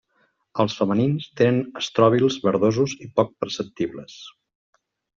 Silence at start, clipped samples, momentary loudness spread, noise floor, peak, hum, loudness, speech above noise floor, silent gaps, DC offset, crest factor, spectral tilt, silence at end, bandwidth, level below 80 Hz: 0.55 s; under 0.1%; 11 LU; -67 dBFS; -4 dBFS; none; -22 LUFS; 45 dB; none; under 0.1%; 20 dB; -5.5 dB/octave; 0.85 s; 7.6 kHz; -60 dBFS